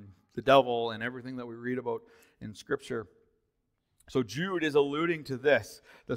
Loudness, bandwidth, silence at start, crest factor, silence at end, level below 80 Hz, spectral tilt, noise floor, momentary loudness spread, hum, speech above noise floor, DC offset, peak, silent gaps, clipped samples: -30 LUFS; 16 kHz; 0 s; 24 dB; 0 s; -66 dBFS; -5.5 dB/octave; -79 dBFS; 20 LU; none; 49 dB; under 0.1%; -8 dBFS; none; under 0.1%